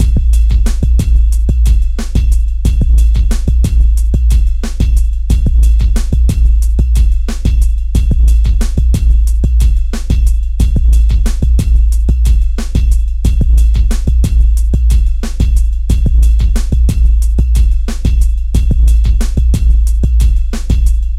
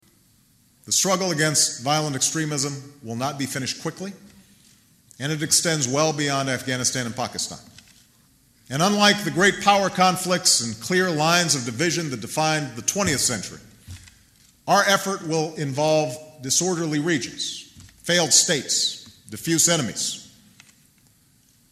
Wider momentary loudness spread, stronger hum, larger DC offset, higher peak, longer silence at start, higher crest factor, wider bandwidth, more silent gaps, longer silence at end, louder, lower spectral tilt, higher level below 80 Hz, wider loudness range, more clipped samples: second, 4 LU vs 13 LU; neither; first, 0.3% vs under 0.1%; about the same, 0 dBFS vs -2 dBFS; second, 0 s vs 0.85 s; second, 8 dB vs 22 dB; second, 11.5 kHz vs 15 kHz; neither; second, 0 s vs 1.45 s; first, -13 LUFS vs -21 LUFS; first, -6.5 dB/octave vs -2.5 dB/octave; first, -8 dBFS vs -60 dBFS; second, 0 LU vs 5 LU; neither